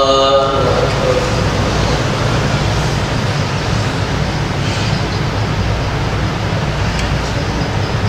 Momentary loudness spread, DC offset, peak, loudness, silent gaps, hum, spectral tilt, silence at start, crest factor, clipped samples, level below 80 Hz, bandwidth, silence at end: 4 LU; under 0.1%; 0 dBFS; -16 LUFS; none; none; -5.5 dB/octave; 0 s; 14 dB; under 0.1%; -24 dBFS; 15 kHz; 0 s